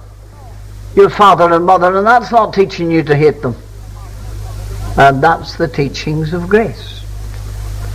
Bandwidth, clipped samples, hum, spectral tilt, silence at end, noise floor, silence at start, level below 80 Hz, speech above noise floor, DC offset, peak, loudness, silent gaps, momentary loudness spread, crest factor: 15.5 kHz; under 0.1%; none; -6.5 dB/octave; 0 s; -33 dBFS; 0 s; -28 dBFS; 22 dB; 0.2%; 0 dBFS; -11 LUFS; none; 20 LU; 12 dB